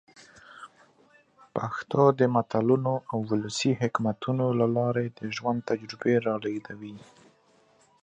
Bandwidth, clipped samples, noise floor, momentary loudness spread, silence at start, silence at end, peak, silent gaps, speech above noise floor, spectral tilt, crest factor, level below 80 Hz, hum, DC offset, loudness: 9.6 kHz; under 0.1%; -63 dBFS; 14 LU; 0.5 s; 1.05 s; -6 dBFS; none; 36 dB; -6.5 dB/octave; 22 dB; -68 dBFS; none; under 0.1%; -27 LUFS